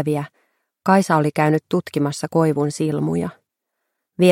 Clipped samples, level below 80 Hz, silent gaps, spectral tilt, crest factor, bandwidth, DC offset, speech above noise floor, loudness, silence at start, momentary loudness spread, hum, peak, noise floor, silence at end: under 0.1%; -62 dBFS; none; -6.5 dB/octave; 18 dB; 16 kHz; under 0.1%; 59 dB; -20 LUFS; 0 s; 10 LU; none; -2 dBFS; -78 dBFS; 0 s